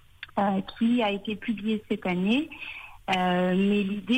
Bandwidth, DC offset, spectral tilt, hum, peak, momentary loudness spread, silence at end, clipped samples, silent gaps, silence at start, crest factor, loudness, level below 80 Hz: 9 kHz; under 0.1%; -7 dB/octave; none; -16 dBFS; 11 LU; 0 s; under 0.1%; none; 0.2 s; 12 dB; -27 LUFS; -58 dBFS